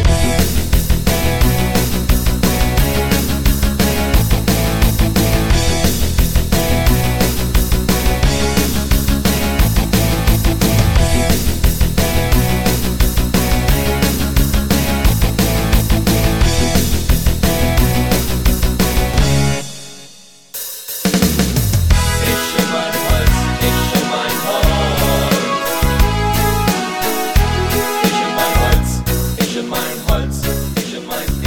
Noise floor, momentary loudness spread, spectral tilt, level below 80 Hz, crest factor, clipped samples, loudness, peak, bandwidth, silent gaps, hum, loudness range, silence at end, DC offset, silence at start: -41 dBFS; 4 LU; -4.5 dB/octave; -18 dBFS; 14 dB; under 0.1%; -15 LUFS; 0 dBFS; 17.5 kHz; none; none; 2 LU; 0 s; under 0.1%; 0 s